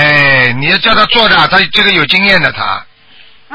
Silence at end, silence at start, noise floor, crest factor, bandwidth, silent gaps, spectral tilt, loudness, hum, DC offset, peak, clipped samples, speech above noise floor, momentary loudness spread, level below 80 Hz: 0 s; 0 s; -42 dBFS; 10 dB; 8 kHz; none; -5 dB/octave; -7 LUFS; none; under 0.1%; 0 dBFS; 0.4%; 33 dB; 8 LU; -38 dBFS